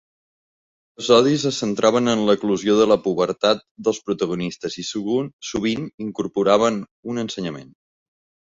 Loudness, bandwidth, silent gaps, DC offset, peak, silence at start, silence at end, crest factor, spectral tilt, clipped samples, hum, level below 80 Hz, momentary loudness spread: -21 LUFS; 8 kHz; 3.71-3.75 s, 5.33-5.39 s, 5.94-5.98 s, 6.91-7.03 s; under 0.1%; -2 dBFS; 1 s; 0.9 s; 18 dB; -5 dB/octave; under 0.1%; none; -58 dBFS; 12 LU